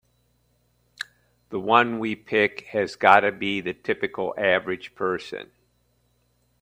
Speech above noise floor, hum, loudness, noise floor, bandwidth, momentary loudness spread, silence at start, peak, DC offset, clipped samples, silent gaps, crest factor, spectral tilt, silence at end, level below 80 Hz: 44 dB; 60 Hz at -55 dBFS; -23 LUFS; -67 dBFS; 16 kHz; 20 LU; 1 s; 0 dBFS; under 0.1%; under 0.1%; none; 26 dB; -5 dB/octave; 1.15 s; -66 dBFS